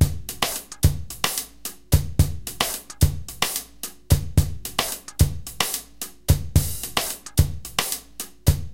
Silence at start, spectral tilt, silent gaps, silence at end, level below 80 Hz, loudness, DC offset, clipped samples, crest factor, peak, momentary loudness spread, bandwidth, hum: 0 s; -4 dB/octave; none; 0 s; -30 dBFS; -24 LUFS; under 0.1%; under 0.1%; 20 dB; -2 dBFS; 8 LU; 17 kHz; none